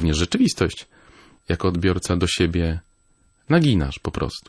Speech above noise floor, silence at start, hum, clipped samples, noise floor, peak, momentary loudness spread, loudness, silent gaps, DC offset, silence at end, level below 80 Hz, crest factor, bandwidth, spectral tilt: 40 dB; 0 s; none; under 0.1%; -60 dBFS; -4 dBFS; 9 LU; -21 LUFS; none; under 0.1%; 0.1 s; -36 dBFS; 18 dB; 11 kHz; -5.5 dB/octave